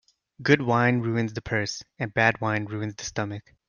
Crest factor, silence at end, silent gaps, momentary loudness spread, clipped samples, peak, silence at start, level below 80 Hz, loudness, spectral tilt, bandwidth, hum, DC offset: 22 dB; 0.3 s; none; 11 LU; under 0.1%; -4 dBFS; 0.4 s; -58 dBFS; -25 LUFS; -5.5 dB/octave; 7.2 kHz; none; under 0.1%